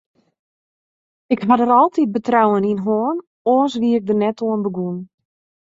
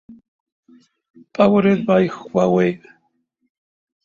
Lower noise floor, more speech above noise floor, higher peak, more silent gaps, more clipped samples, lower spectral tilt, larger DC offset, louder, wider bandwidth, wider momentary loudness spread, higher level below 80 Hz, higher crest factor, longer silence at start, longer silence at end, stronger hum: first, under -90 dBFS vs -68 dBFS; first, over 73 dB vs 52 dB; about the same, -2 dBFS vs -2 dBFS; second, 3.27-3.45 s vs 0.28-0.46 s, 0.52-0.63 s, 1.10-1.14 s; neither; about the same, -7.5 dB/octave vs -8 dB/octave; neither; about the same, -18 LUFS vs -17 LUFS; about the same, 7.6 kHz vs 7.2 kHz; about the same, 9 LU vs 11 LU; second, -64 dBFS vs -58 dBFS; about the same, 18 dB vs 18 dB; first, 1.3 s vs 0.1 s; second, 0.55 s vs 1.3 s; neither